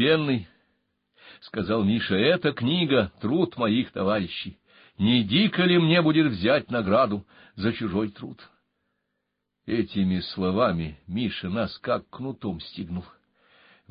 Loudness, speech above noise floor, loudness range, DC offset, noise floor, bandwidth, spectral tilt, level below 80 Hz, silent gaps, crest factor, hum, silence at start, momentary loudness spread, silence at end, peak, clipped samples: -25 LUFS; 55 dB; 7 LU; under 0.1%; -80 dBFS; 5.4 kHz; -10.5 dB/octave; -52 dBFS; none; 16 dB; none; 0 s; 14 LU; 0.85 s; -8 dBFS; under 0.1%